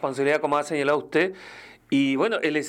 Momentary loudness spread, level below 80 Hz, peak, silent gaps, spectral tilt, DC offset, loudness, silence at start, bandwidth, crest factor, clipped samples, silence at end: 6 LU; -68 dBFS; -10 dBFS; none; -5 dB/octave; under 0.1%; -24 LUFS; 0 s; 11.5 kHz; 14 dB; under 0.1%; 0 s